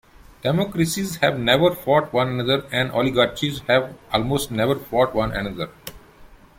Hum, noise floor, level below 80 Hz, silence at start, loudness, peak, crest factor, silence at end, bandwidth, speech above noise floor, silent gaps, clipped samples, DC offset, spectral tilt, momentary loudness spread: none; -47 dBFS; -46 dBFS; 0.45 s; -21 LUFS; -2 dBFS; 20 dB; 0.25 s; 16.5 kHz; 26 dB; none; under 0.1%; under 0.1%; -5 dB/octave; 9 LU